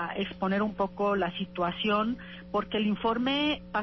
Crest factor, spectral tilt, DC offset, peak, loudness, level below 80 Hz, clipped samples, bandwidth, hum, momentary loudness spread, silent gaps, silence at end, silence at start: 14 dB; -7 dB/octave; under 0.1%; -16 dBFS; -29 LUFS; -56 dBFS; under 0.1%; 6 kHz; 60 Hz at -45 dBFS; 6 LU; none; 0 s; 0 s